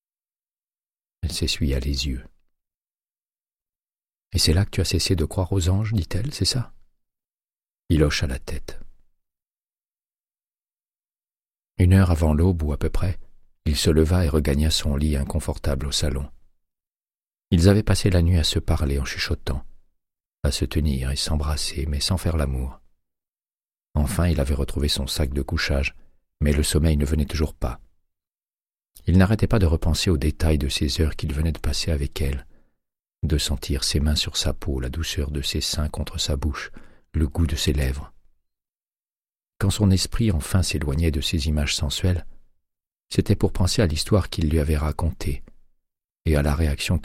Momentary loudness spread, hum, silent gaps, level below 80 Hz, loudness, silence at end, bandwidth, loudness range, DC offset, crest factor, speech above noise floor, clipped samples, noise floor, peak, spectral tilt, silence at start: 10 LU; none; 2.77-2.85 s, 10.20-10.24 s; -30 dBFS; -23 LUFS; 0 s; 15.5 kHz; 5 LU; under 0.1%; 20 dB; over 69 dB; under 0.1%; under -90 dBFS; -2 dBFS; -5 dB/octave; 1.25 s